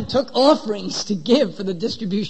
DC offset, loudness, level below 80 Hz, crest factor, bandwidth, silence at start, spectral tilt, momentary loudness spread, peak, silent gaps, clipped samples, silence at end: 1%; -20 LUFS; -52 dBFS; 16 dB; 8.8 kHz; 0 s; -5 dB/octave; 9 LU; -4 dBFS; none; under 0.1%; 0 s